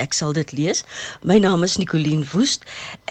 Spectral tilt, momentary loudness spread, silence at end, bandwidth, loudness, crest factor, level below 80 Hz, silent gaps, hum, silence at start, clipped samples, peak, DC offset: -4.5 dB/octave; 12 LU; 0.15 s; 11 kHz; -20 LUFS; 16 dB; -54 dBFS; none; none; 0 s; under 0.1%; -4 dBFS; under 0.1%